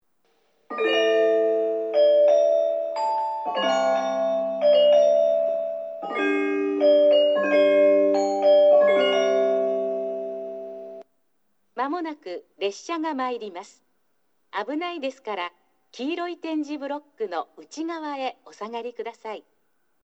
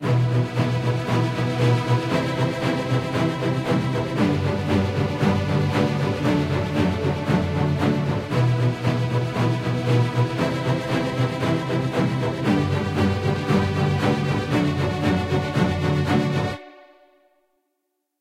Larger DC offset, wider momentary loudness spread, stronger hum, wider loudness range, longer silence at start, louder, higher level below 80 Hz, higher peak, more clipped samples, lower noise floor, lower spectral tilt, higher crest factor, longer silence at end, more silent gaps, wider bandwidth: neither; first, 17 LU vs 3 LU; neither; first, 13 LU vs 1 LU; first, 0.7 s vs 0 s; about the same, -22 LUFS vs -22 LUFS; second, -88 dBFS vs -46 dBFS; about the same, -8 dBFS vs -6 dBFS; neither; about the same, -73 dBFS vs -76 dBFS; second, -4 dB/octave vs -7 dB/octave; about the same, 14 dB vs 14 dB; second, 0.65 s vs 1.45 s; neither; second, 8 kHz vs 13 kHz